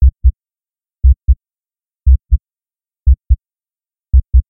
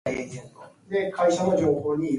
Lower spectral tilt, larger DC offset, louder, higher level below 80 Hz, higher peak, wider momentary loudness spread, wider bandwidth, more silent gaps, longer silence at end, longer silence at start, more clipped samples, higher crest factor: first, -16 dB/octave vs -6 dB/octave; neither; first, -16 LUFS vs -24 LUFS; first, -14 dBFS vs -58 dBFS; first, 0 dBFS vs -10 dBFS; second, 6 LU vs 13 LU; second, 0.3 kHz vs 11.5 kHz; neither; about the same, 0.1 s vs 0 s; about the same, 0 s vs 0.05 s; neither; about the same, 12 dB vs 16 dB